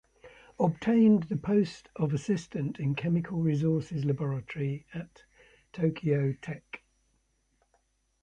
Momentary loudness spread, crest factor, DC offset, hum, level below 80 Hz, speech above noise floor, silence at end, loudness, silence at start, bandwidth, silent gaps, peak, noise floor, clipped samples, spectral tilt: 18 LU; 16 dB; under 0.1%; none; -62 dBFS; 44 dB; 1.45 s; -29 LUFS; 0.25 s; 9 kHz; none; -14 dBFS; -73 dBFS; under 0.1%; -8.5 dB/octave